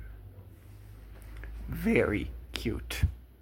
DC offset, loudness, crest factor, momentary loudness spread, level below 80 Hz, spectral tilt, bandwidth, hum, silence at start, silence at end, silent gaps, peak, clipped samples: under 0.1%; -31 LUFS; 24 dB; 24 LU; -42 dBFS; -6 dB/octave; 16.5 kHz; none; 0 s; 0.05 s; none; -10 dBFS; under 0.1%